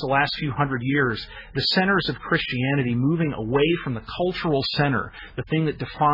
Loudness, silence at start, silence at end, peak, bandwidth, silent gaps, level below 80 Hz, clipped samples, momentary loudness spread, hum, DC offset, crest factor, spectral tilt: -23 LUFS; 0 s; 0 s; -8 dBFS; 5.8 kHz; none; -46 dBFS; under 0.1%; 6 LU; none; under 0.1%; 16 dB; -7.5 dB/octave